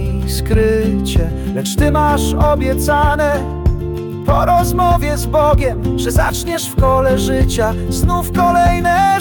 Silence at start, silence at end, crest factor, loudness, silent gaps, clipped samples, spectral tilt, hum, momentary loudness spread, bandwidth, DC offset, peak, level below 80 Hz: 0 s; 0 s; 10 dB; -15 LUFS; none; under 0.1%; -6 dB/octave; none; 6 LU; 19 kHz; under 0.1%; -4 dBFS; -20 dBFS